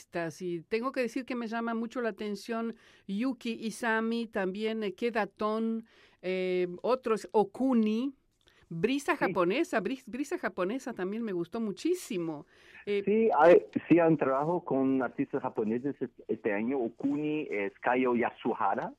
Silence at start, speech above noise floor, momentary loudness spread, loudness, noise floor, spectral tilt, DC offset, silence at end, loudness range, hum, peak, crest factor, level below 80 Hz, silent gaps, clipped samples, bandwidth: 0.15 s; 35 dB; 10 LU; -31 LUFS; -66 dBFS; -6 dB/octave; under 0.1%; 0.05 s; 7 LU; none; -12 dBFS; 18 dB; -72 dBFS; none; under 0.1%; 15 kHz